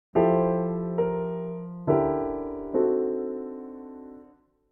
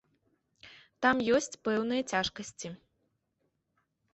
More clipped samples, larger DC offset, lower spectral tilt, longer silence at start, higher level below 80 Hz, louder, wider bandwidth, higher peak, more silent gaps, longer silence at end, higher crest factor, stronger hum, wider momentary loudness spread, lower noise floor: neither; neither; first, -12 dB/octave vs -3.5 dB/octave; second, 0.15 s vs 0.65 s; first, -54 dBFS vs -66 dBFS; first, -27 LUFS vs -30 LUFS; second, 3 kHz vs 8.4 kHz; first, -10 dBFS vs -14 dBFS; neither; second, 0.45 s vs 1.4 s; about the same, 18 dB vs 20 dB; neither; first, 18 LU vs 15 LU; second, -57 dBFS vs -79 dBFS